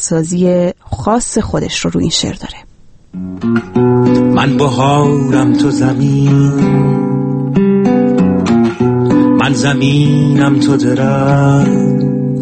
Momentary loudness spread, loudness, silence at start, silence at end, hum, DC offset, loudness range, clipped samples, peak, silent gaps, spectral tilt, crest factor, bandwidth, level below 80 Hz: 6 LU; -11 LUFS; 0 s; 0 s; none; under 0.1%; 4 LU; under 0.1%; 0 dBFS; none; -6.5 dB/octave; 10 dB; 8.8 kHz; -38 dBFS